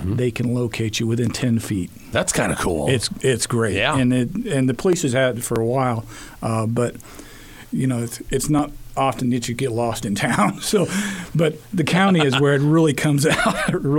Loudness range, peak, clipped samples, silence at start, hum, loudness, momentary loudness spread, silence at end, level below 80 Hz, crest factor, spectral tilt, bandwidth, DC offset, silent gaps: 5 LU; -4 dBFS; under 0.1%; 0 s; none; -20 LUFS; 8 LU; 0 s; -42 dBFS; 16 dB; -5 dB/octave; 17.5 kHz; under 0.1%; none